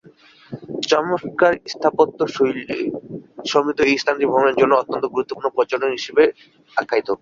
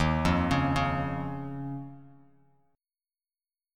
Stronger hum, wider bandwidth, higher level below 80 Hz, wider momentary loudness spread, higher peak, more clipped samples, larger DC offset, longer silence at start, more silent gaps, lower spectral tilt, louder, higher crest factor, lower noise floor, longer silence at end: neither; second, 7.6 kHz vs 13.5 kHz; second, -60 dBFS vs -44 dBFS; second, 10 LU vs 14 LU; first, -2 dBFS vs -12 dBFS; neither; neither; first, 0.5 s vs 0 s; neither; second, -4.5 dB/octave vs -6.5 dB/octave; first, -19 LUFS vs -29 LUFS; about the same, 18 dB vs 20 dB; second, -49 dBFS vs under -90 dBFS; second, 0.05 s vs 1.65 s